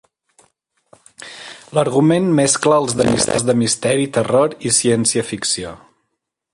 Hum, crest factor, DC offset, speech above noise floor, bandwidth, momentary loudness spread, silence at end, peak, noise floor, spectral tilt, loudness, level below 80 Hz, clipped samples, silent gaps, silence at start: none; 16 dB; under 0.1%; 59 dB; 11.5 kHz; 18 LU; 0.8 s; 0 dBFS; -75 dBFS; -4 dB/octave; -16 LUFS; -50 dBFS; under 0.1%; none; 1.2 s